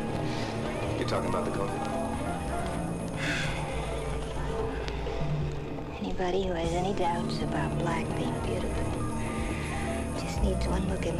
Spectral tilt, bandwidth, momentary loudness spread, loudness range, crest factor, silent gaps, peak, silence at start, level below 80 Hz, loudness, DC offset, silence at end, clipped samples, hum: -6 dB/octave; 14 kHz; 4 LU; 2 LU; 18 dB; none; -12 dBFS; 0 s; -38 dBFS; -31 LUFS; under 0.1%; 0 s; under 0.1%; none